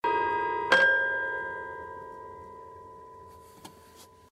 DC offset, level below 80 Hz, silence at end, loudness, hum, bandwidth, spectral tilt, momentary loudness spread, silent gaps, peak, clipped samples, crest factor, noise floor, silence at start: under 0.1%; -64 dBFS; 0.25 s; -26 LUFS; none; 14.5 kHz; -3 dB/octave; 27 LU; none; -8 dBFS; under 0.1%; 22 dB; -54 dBFS; 0.05 s